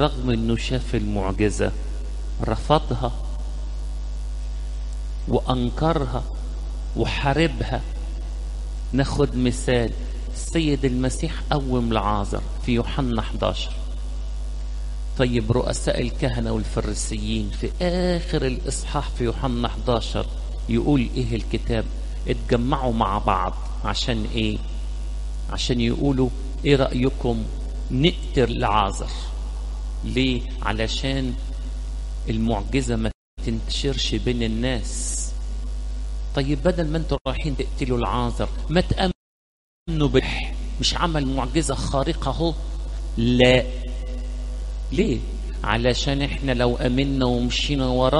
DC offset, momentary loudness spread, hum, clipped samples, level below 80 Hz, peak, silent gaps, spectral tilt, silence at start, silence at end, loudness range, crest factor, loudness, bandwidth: under 0.1%; 11 LU; 50 Hz at -30 dBFS; under 0.1%; -28 dBFS; -2 dBFS; 33.15-33.37 s, 37.21-37.25 s, 39.15-39.86 s; -5.5 dB/octave; 0 s; 0 s; 4 LU; 20 dB; -24 LUFS; 11.5 kHz